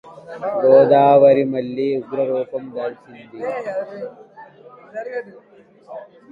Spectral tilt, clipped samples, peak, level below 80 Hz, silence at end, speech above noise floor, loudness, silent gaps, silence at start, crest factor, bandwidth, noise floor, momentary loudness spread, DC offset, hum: -8.5 dB/octave; under 0.1%; 0 dBFS; -64 dBFS; 0.3 s; 26 dB; -17 LUFS; none; 0.05 s; 18 dB; 4.8 kHz; -43 dBFS; 24 LU; under 0.1%; none